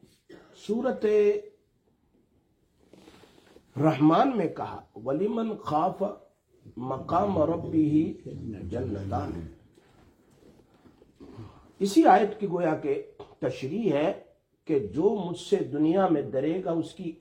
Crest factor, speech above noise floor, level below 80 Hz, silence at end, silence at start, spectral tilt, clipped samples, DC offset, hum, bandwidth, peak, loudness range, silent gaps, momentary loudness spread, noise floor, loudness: 22 dB; 42 dB; -62 dBFS; 0.05 s; 0.3 s; -7.5 dB/octave; under 0.1%; under 0.1%; none; 12 kHz; -6 dBFS; 5 LU; none; 17 LU; -68 dBFS; -27 LUFS